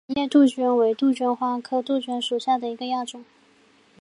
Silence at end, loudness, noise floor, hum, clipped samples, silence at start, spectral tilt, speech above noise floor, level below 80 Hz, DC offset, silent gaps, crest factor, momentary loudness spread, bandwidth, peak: 0.8 s; -23 LUFS; -58 dBFS; none; under 0.1%; 0.1 s; -4 dB/octave; 35 dB; -68 dBFS; under 0.1%; none; 16 dB; 10 LU; 11 kHz; -6 dBFS